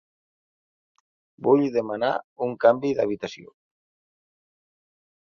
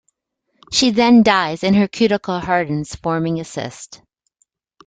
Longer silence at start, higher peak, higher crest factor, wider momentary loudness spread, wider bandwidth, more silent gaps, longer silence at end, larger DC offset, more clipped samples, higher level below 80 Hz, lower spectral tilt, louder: first, 1.4 s vs 0.7 s; about the same, -4 dBFS vs -2 dBFS; about the same, 22 dB vs 18 dB; second, 12 LU vs 16 LU; second, 7 kHz vs 9.4 kHz; first, 2.24-2.36 s vs none; first, 1.85 s vs 0.9 s; neither; neither; second, -70 dBFS vs -50 dBFS; first, -7 dB/octave vs -5 dB/octave; second, -23 LUFS vs -17 LUFS